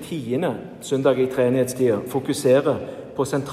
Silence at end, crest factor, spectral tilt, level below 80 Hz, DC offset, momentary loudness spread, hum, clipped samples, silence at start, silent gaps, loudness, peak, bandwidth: 0 s; 16 dB; -6 dB/octave; -60 dBFS; under 0.1%; 9 LU; none; under 0.1%; 0 s; none; -22 LUFS; -6 dBFS; 15.5 kHz